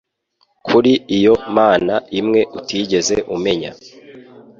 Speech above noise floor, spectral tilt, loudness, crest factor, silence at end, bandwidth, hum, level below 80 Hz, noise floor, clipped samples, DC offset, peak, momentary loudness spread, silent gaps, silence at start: 48 dB; -4.5 dB/octave; -16 LUFS; 16 dB; 0.4 s; 7.6 kHz; none; -50 dBFS; -63 dBFS; under 0.1%; under 0.1%; -2 dBFS; 9 LU; none; 0.65 s